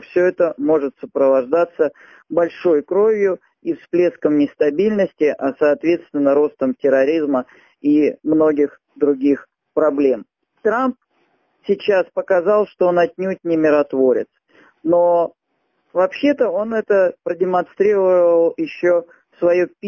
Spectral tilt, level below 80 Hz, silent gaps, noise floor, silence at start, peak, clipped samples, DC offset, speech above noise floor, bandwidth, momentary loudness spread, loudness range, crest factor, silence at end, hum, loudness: -7.5 dB/octave; -64 dBFS; none; -69 dBFS; 0.15 s; -2 dBFS; under 0.1%; under 0.1%; 52 dB; 6.8 kHz; 8 LU; 2 LU; 14 dB; 0 s; none; -18 LUFS